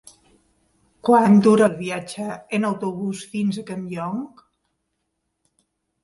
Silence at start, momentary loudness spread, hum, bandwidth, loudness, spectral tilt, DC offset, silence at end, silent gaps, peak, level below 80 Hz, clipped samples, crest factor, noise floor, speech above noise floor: 1.05 s; 16 LU; none; 11.5 kHz; -21 LUFS; -6.5 dB/octave; under 0.1%; 1.75 s; none; -4 dBFS; -64 dBFS; under 0.1%; 18 dB; -76 dBFS; 56 dB